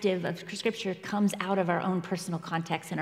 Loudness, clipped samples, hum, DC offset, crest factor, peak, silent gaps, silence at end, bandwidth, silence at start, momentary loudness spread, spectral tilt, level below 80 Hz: -31 LUFS; under 0.1%; none; under 0.1%; 18 dB; -12 dBFS; none; 0 s; 15 kHz; 0 s; 6 LU; -5.5 dB/octave; -76 dBFS